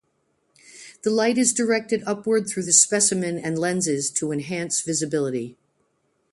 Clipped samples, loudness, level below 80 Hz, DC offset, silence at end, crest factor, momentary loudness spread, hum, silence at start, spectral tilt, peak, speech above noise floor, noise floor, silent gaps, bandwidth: under 0.1%; -21 LUFS; -68 dBFS; under 0.1%; 0.8 s; 22 dB; 11 LU; none; 0.75 s; -3 dB/octave; -2 dBFS; 47 dB; -69 dBFS; none; 11.5 kHz